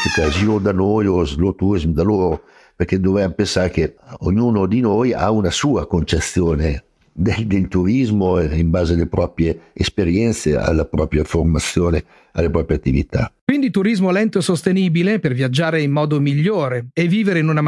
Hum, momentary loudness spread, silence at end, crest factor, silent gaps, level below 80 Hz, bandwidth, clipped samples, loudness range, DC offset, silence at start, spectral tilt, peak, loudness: none; 5 LU; 0 s; 16 dB; 13.41-13.47 s; -32 dBFS; 12 kHz; under 0.1%; 1 LU; under 0.1%; 0 s; -6.5 dB/octave; 0 dBFS; -18 LUFS